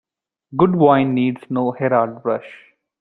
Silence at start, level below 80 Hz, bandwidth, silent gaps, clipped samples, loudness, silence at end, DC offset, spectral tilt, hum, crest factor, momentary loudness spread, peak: 0.5 s; -58 dBFS; 4.1 kHz; none; under 0.1%; -18 LUFS; 0.45 s; under 0.1%; -10 dB/octave; none; 18 dB; 10 LU; -2 dBFS